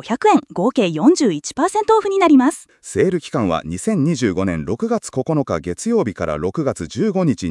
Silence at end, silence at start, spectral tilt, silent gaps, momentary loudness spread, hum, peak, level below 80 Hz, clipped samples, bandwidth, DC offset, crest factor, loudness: 0 s; 0.05 s; -6 dB/octave; none; 8 LU; none; -2 dBFS; -50 dBFS; under 0.1%; 12 kHz; under 0.1%; 16 dB; -18 LUFS